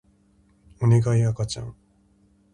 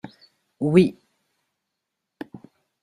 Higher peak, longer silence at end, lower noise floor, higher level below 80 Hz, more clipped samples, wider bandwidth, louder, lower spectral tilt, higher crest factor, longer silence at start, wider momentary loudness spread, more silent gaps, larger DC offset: second, -8 dBFS vs -4 dBFS; first, 0.85 s vs 0.45 s; second, -60 dBFS vs -82 dBFS; first, -50 dBFS vs -62 dBFS; neither; about the same, 11 kHz vs 10.5 kHz; second, -23 LUFS vs -20 LUFS; about the same, -7 dB/octave vs -8 dB/octave; about the same, 18 dB vs 22 dB; first, 0.8 s vs 0.05 s; second, 14 LU vs 24 LU; neither; neither